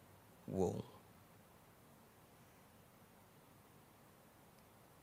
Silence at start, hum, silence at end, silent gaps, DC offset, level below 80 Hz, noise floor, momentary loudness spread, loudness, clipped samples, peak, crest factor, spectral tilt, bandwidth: 0 s; none; 1.6 s; none; under 0.1%; -80 dBFS; -65 dBFS; 24 LU; -44 LUFS; under 0.1%; -26 dBFS; 26 dB; -7 dB/octave; 16 kHz